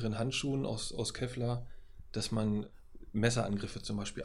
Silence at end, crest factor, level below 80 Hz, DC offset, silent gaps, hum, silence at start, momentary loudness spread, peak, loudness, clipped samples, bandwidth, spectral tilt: 0 s; 20 dB; -52 dBFS; under 0.1%; none; none; 0 s; 9 LU; -14 dBFS; -36 LUFS; under 0.1%; 12.5 kHz; -5 dB/octave